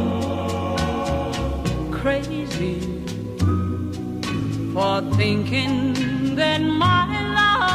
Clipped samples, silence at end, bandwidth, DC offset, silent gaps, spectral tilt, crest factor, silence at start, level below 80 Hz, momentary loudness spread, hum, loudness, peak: under 0.1%; 0 s; 14.5 kHz; under 0.1%; none; -6 dB/octave; 16 dB; 0 s; -36 dBFS; 9 LU; none; -22 LUFS; -6 dBFS